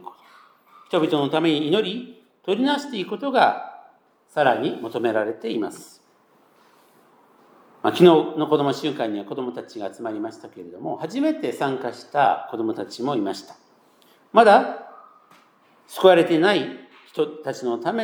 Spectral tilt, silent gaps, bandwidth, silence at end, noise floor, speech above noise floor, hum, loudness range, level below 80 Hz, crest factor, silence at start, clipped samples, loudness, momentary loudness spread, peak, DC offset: -5.5 dB/octave; none; 19 kHz; 0 s; -59 dBFS; 38 dB; none; 7 LU; -82 dBFS; 22 dB; 0.05 s; under 0.1%; -21 LUFS; 18 LU; 0 dBFS; under 0.1%